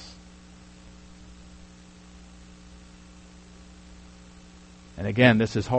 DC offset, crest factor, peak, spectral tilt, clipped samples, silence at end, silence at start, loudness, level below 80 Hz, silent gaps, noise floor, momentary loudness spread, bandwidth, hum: under 0.1%; 26 dB; -4 dBFS; -6.5 dB/octave; under 0.1%; 0 s; 0 s; -21 LUFS; -52 dBFS; none; -49 dBFS; 30 LU; 8.4 kHz; 60 Hz at -50 dBFS